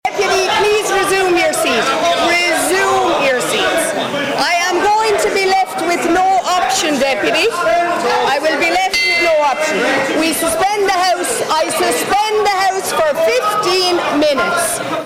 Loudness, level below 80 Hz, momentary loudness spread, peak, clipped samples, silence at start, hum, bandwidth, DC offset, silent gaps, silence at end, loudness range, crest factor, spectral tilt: -14 LUFS; -48 dBFS; 3 LU; -8 dBFS; under 0.1%; 0.05 s; none; 17 kHz; under 0.1%; none; 0 s; 1 LU; 6 dB; -2 dB/octave